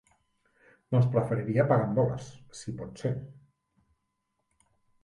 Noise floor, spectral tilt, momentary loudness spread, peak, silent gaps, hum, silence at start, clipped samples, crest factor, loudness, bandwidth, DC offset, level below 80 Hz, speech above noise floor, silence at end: -80 dBFS; -8 dB/octave; 16 LU; -10 dBFS; none; none; 0.9 s; under 0.1%; 20 dB; -28 LUFS; 11 kHz; under 0.1%; -62 dBFS; 52 dB; 1.7 s